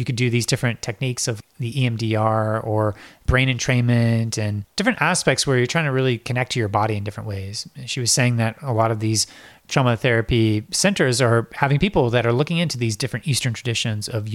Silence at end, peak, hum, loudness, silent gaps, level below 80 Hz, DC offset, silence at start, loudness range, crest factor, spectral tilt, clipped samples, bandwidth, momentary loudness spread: 0 s; -2 dBFS; none; -21 LUFS; none; -42 dBFS; under 0.1%; 0 s; 3 LU; 20 dB; -4.5 dB/octave; under 0.1%; 14.5 kHz; 8 LU